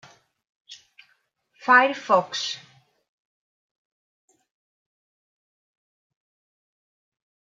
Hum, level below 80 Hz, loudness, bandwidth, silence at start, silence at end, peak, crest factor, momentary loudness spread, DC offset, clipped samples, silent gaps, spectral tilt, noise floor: none; -86 dBFS; -21 LUFS; 7.8 kHz; 0.7 s; 4.85 s; -4 dBFS; 26 dB; 15 LU; under 0.1%; under 0.1%; none; -2.5 dB/octave; -68 dBFS